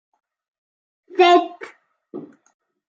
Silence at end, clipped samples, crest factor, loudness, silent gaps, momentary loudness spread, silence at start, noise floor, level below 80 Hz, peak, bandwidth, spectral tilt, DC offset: 0.7 s; under 0.1%; 20 dB; -16 LUFS; none; 25 LU; 1.15 s; -39 dBFS; -86 dBFS; -2 dBFS; 7.4 kHz; -3.5 dB/octave; under 0.1%